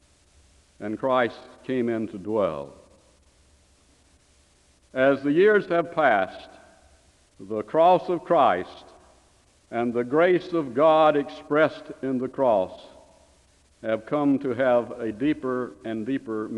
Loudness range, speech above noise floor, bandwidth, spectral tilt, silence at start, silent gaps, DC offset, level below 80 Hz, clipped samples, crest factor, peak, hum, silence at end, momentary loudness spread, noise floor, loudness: 6 LU; 37 dB; 10.5 kHz; -7 dB/octave; 0.8 s; none; under 0.1%; -62 dBFS; under 0.1%; 18 dB; -6 dBFS; none; 0 s; 14 LU; -60 dBFS; -24 LUFS